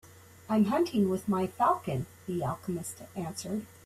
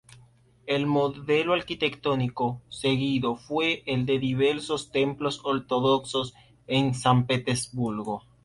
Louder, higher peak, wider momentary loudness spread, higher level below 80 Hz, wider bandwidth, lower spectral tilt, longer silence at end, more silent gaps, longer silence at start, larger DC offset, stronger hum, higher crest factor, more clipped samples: second, -31 LUFS vs -26 LUFS; second, -14 dBFS vs -8 dBFS; first, 10 LU vs 7 LU; second, -64 dBFS vs -58 dBFS; first, 15 kHz vs 11.5 kHz; about the same, -6.5 dB/octave vs -5.5 dB/octave; about the same, 0.2 s vs 0.25 s; neither; second, 0.05 s vs 0.65 s; neither; neither; about the same, 16 dB vs 18 dB; neither